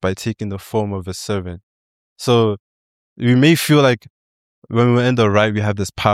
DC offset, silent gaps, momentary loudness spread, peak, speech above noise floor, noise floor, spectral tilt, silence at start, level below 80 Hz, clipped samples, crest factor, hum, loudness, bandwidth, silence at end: under 0.1%; 1.63-2.16 s, 2.60-3.16 s, 4.10-4.62 s; 13 LU; -2 dBFS; over 74 dB; under -90 dBFS; -6 dB/octave; 0.05 s; -50 dBFS; under 0.1%; 16 dB; none; -17 LUFS; 16 kHz; 0 s